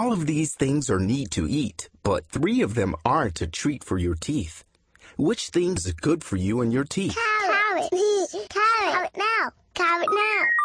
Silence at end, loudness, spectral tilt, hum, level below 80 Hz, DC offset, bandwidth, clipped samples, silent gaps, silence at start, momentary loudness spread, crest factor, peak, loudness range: 0 s; -24 LUFS; -5 dB/octave; none; -46 dBFS; under 0.1%; 10.5 kHz; under 0.1%; none; 0 s; 7 LU; 18 dB; -6 dBFS; 4 LU